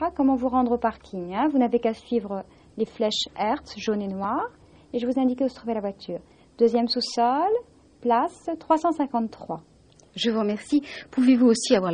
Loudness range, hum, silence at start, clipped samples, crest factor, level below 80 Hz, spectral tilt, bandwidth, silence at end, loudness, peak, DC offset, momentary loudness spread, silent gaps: 3 LU; none; 0 s; under 0.1%; 18 dB; -58 dBFS; -5 dB/octave; 10 kHz; 0 s; -24 LUFS; -6 dBFS; under 0.1%; 13 LU; none